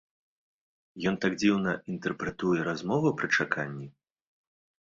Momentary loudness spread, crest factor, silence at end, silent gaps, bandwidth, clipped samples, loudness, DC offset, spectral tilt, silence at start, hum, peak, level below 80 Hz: 8 LU; 20 dB; 0.95 s; none; 7.6 kHz; under 0.1%; -29 LUFS; under 0.1%; -5.5 dB/octave; 0.95 s; none; -10 dBFS; -64 dBFS